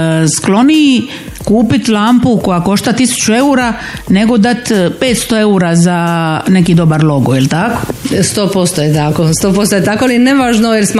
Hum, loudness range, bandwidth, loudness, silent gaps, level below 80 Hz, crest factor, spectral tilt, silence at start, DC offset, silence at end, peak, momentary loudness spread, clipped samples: none; 1 LU; 15.5 kHz; -10 LUFS; none; -36 dBFS; 10 dB; -5 dB/octave; 0 s; 0.1%; 0 s; 0 dBFS; 5 LU; under 0.1%